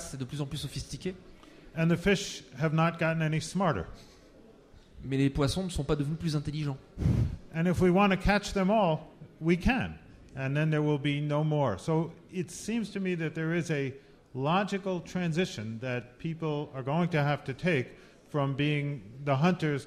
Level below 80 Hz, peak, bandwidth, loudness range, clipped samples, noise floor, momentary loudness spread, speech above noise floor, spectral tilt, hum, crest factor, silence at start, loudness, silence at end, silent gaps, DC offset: -46 dBFS; -12 dBFS; 14 kHz; 4 LU; under 0.1%; -55 dBFS; 11 LU; 26 dB; -6.5 dB/octave; none; 18 dB; 0 s; -30 LUFS; 0 s; none; under 0.1%